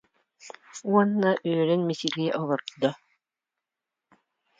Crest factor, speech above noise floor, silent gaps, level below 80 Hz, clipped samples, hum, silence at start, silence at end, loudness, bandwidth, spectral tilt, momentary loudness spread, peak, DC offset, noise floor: 22 dB; 63 dB; none; -78 dBFS; under 0.1%; none; 0.45 s; 1.65 s; -26 LUFS; 7.8 kHz; -6 dB/octave; 21 LU; -6 dBFS; under 0.1%; -88 dBFS